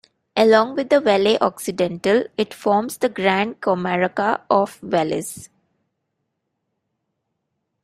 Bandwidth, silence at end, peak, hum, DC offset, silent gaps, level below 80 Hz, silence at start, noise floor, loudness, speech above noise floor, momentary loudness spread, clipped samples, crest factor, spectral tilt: 15.5 kHz; 2.4 s; -2 dBFS; none; under 0.1%; none; -62 dBFS; 0.35 s; -76 dBFS; -19 LUFS; 57 dB; 8 LU; under 0.1%; 18 dB; -5 dB/octave